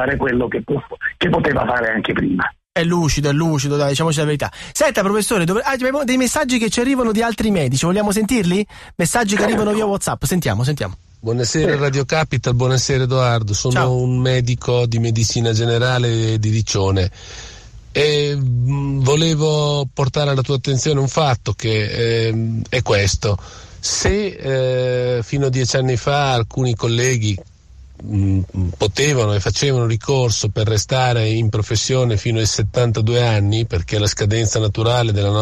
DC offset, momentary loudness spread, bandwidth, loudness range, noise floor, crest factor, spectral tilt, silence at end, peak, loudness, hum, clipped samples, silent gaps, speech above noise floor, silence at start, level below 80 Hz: under 0.1%; 5 LU; 13.5 kHz; 2 LU; -42 dBFS; 12 dB; -5 dB/octave; 0 s; -4 dBFS; -18 LUFS; none; under 0.1%; none; 25 dB; 0 s; -38 dBFS